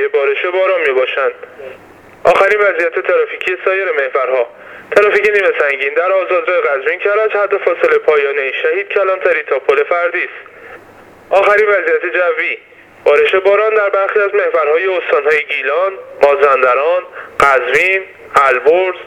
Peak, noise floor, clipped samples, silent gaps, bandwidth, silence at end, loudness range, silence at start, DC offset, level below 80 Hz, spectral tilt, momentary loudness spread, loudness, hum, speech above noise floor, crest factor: 0 dBFS; -39 dBFS; under 0.1%; none; 12 kHz; 0 s; 2 LU; 0 s; under 0.1%; -54 dBFS; -3.5 dB/octave; 7 LU; -13 LUFS; none; 27 dB; 14 dB